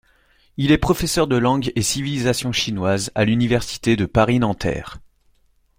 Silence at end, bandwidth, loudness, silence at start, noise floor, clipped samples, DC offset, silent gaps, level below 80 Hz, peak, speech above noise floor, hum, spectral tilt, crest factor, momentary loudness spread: 0.8 s; 16.5 kHz; -19 LUFS; 0.6 s; -59 dBFS; under 0.1%; under 0.1%; none; -38 dBFS; -2 dBFS; 40 dB; none; -5 dB/octave; 18 dB; 7 LU